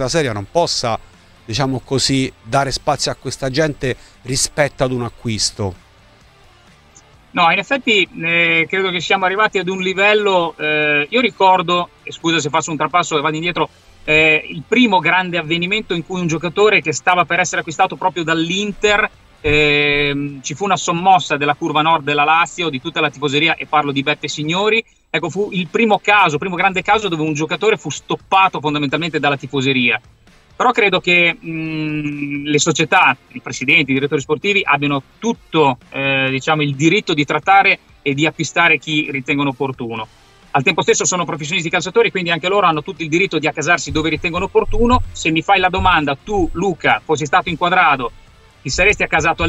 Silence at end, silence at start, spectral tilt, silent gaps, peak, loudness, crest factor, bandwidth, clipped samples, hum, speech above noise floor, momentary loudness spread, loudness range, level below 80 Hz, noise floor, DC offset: 0 s; 0 s; -4 dB/octave; none; -2 dBFS; -16 LUFS; 16 dB; 13 kHz; under 0.1%; none; 31 dB; 9 LU; 4 LU; -36 dBFS; -47 dBFS; under 0.1%